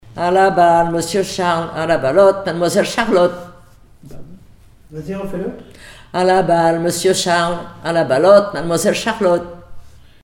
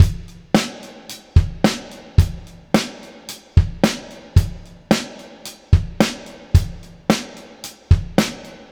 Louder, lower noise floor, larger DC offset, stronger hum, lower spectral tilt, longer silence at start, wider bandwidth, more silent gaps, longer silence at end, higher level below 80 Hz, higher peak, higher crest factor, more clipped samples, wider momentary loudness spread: first, -15 LUFS vs -20 LUFS; first, -44 dBFS vs -39 dBFS; neither; neither; about the same, -4.5 dB/octave vs -5.5 dB/octave; about the same, 0.05 s vs 0 s; about the same, 17.5 kHz vs 18 kHz; neither; first, 0.35 s vs 0.2 s; second, -44 dBFS vs -26 dBFS; about the same, 0 dBFS vs 0 dBFS; about the same, 16 dB vs 20 dB; neither; second, 14 LU vs 18 LU